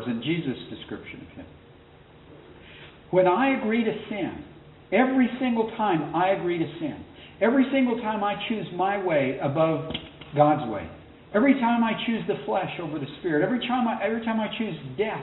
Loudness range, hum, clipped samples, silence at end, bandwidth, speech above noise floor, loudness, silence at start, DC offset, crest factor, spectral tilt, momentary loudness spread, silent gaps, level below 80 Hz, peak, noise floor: 3 LU; none; under 0.1%; 0 s; 4.1 kHz; 26 dB; -25 LUFS; 0 s; under 0.1%; 20 dB; -4.5 dB/octave; 16 LU; none; -58 dBFS; -6 dBFS; -51 dBFS